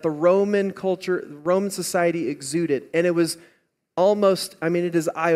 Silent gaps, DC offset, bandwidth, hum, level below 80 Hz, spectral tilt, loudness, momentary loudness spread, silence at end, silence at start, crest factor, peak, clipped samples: none; under 0.1%; 15.5 kHz; none; -70 dBFS; -5 dB/octave; -22 LUFS; 7 LU; 0 s; 0.05 s; 16 dB; -6 dBFS; under 0.1%